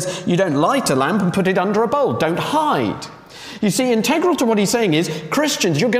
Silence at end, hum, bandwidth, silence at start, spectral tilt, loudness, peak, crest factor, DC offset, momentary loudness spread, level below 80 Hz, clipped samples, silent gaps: 0 s; none; 16 kHz; 0 s; -4.5 dB/octave; -17 LUFS; -4 dBFS; 14 dB; under 0.1%; 5 LU; -56 dBFS; under 0.1%; none